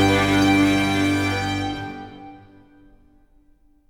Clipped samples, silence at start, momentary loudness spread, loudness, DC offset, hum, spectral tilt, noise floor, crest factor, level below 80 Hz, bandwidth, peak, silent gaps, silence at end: under 0.1%; 0 s; 20 LU; -20 LUFS; under 0.1%; none; -5 dB/octave; -56 dBFS; 16 dB; -44 dBFS; 16.5 kHz; -6 dBFS; none; 1.5 s